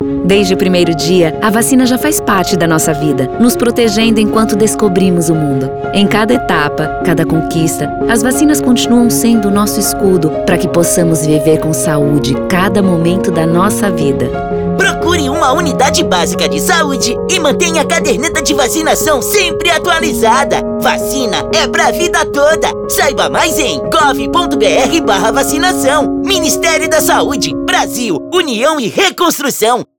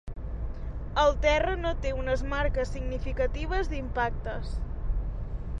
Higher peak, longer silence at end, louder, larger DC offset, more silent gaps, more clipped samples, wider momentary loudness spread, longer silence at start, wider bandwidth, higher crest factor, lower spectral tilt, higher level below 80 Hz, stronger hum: first, 0 dBFS vs -10 dBFS; first, 0.15 s vs 0 s; first, -11 LUFS vs -30 LUFS; neither; neither; neither; second, 4 LU vs 13 LU; about the same, 0 s vs 0.05 s; first, over 20 kHz vs 9 kHz; second, 10 dB vs 18 dB; second, -4 dB/octave vs -6 dB/octave; about the same, -34 dBFS vs -32 dBFS; neither